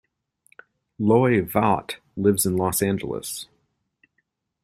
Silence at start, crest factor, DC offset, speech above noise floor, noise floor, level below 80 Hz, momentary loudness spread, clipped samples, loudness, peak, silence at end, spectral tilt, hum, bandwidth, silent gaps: 1 s; 20 dB; under 0.1%; 52 dB; -74 dBFS; -56 dBFS; 14 LU; under 0.1%; -22 LUFS; -4 dBFS; 1.2 s; -5.5 dB/octave; none; 16 kHz; none